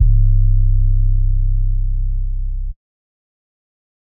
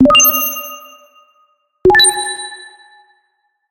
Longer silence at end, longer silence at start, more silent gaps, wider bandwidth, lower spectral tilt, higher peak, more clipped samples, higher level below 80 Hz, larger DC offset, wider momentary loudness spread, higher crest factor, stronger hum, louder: first, 1.4 s vs 1.05 s; about the same, 0 s vs 0 s; neither; second, 0.3 kHz vs 17 kHz; first, -15.5 dB/octave vs -1 dB/octave; about the same, -2 dBFS vs 0 dBFS; neither; first, -16 dBFS vs -42 dBFS; neither; second, 11 LU vs 22 LU; about the same, 12 dB vs 14 dB; neither; second, -19 LUFS vs -11 LUFS